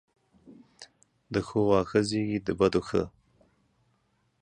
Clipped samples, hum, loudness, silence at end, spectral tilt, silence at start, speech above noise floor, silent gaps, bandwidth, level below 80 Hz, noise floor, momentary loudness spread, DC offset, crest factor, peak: under 0.1%; none; -27 LUFS; 1.35 s; -6.5 dB/octave; 0.5 s; 45 dB; none; 10 kHz; -54 dBFS; -72 dBFS; 8 LU; under 0.1%; 20 dB; -10 dBFS